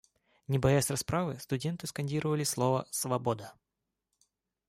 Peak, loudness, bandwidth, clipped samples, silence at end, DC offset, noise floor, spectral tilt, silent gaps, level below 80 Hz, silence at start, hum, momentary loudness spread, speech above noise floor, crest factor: -14 dBFS; -32 LUFS; 16 kHz; under 0.1%; 1.2 s; under 0.1%; -87 dBFS; -5 dB/octave; none; -58 dBFS; 0.5 s; none; 9 LU; 55 dB; 18 dB